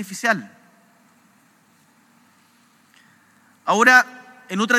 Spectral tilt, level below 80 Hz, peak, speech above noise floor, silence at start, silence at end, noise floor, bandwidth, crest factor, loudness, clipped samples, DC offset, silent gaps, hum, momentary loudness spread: -3 dB/octave; under -90 dBFS; 0 dBFS; 40 dB; 0 s; 0 s; -57 dBFS; 16 kHz; 24 dB; -18 LUFS; under 0.1%; under 0.1%; none; none; 17 LU